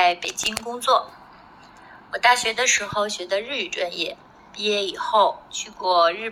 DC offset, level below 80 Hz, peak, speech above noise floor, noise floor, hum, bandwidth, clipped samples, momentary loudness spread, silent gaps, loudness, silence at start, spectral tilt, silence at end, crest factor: under 0.1%; -60 dBFS; -4 dBFS; 25 dB; -47 dBFS; none; 18.5 kHz; under 0.1%; 11 LU; none; -22 LUFS; 0 s; -0.5 dB/octave; 0 s; 18 dB